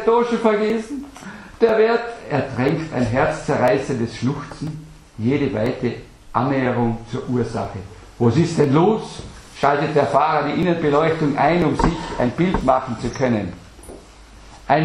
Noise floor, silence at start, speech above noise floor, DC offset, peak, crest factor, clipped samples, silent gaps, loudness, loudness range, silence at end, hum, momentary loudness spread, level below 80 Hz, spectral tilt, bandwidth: -43 dBFS; 0 s; 24 dB; under 0.1%; -2 dBFS; 18 dB; under 0.1%; none; -20 LUFS; 4 LU; 0 s; none; 17 LU; -40 dBFS; -7 dB/octave; 11.5 kHz